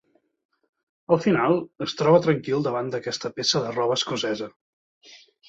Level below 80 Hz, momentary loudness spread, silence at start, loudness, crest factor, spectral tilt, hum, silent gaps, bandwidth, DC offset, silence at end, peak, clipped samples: -66 dBFS; 10 LU; 1.1 s; -23 LUFS; 20 dB; -5 dB/octave; none; 4.56-5.01 s; 8 kHz; under 0.1%; 0.35 s; -6 dBFS; under 0.1%